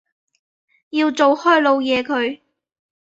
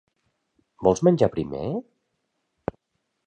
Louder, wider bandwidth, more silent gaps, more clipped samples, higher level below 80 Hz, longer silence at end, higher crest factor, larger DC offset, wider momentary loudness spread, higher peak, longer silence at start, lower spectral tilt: first, -17 LUFS vs -23 LUFS; second, 7.8 kHz vs 9.2 kHz; neither; neither; second, -64 dBFS vs -52 dBFS; second, 0.75 s vs 1.45 s; second, 18 dB vs 24 dB; neither; second, 11 LU vs 16 LU; about the same, -2 dBFS vs -4 dBFS; first, 0.95 s vs 0.8 s; second, -3.5 dB/octave vs -7.5 dB/octave